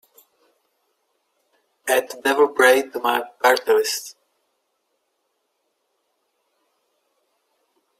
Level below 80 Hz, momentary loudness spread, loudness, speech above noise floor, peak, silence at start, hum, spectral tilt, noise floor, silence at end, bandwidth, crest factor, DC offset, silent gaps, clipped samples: -74 dBFS; 11 LU; -19 LUFS; 54 dB; -2 dBFS; 1.85 s; none; -0.5 dB/octave; -73 dBFS; 3.9 s; 16 kHz; 22 dB; under 0.1%; none; under 0.1%